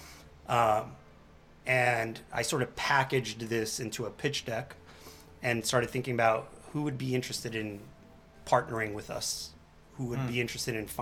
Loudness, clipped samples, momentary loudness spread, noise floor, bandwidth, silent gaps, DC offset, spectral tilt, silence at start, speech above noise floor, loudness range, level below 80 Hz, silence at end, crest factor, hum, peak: -31 LUFS; under 0.1%; 18 LU; -56 dBFS; 18.5 kHz; none; under 0.1%; -4 dB/octave; 0 s; 25 dB; 4 LU; -58 dBFS; 0 s; 22 dB; none; -10 dBFS